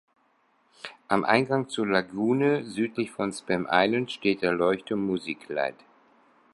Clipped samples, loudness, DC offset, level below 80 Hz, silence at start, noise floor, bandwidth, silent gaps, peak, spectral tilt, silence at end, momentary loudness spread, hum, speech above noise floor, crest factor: under 0.1%; -26 LUFS; under 0.1%; -66 dBFS; 0.85 s; -67 dBFS; 11.5 kHz; none; -4 dBFS; -5.5 dB/octave; 0.8 s; 9 LU; none; 41 dB; 24 dB